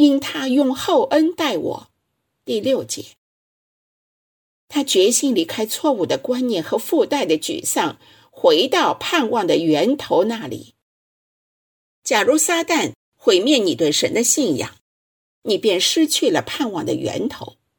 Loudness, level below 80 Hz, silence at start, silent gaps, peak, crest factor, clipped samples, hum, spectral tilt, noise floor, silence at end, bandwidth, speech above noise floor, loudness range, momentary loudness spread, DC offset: -18 LUFS; -64 dBFS; 0 s; 3.18-4.68 s, 10.82-12.02 s, 12.95-13.12 s, 14.81-15.42 s; -2 dBFS; 18 dB; under 0.1%; none; -3 dB/octave; -73 dBFS; 0.3 s; 19 kHz; 55 dB; 4 LU; 10 LU; under 0.1%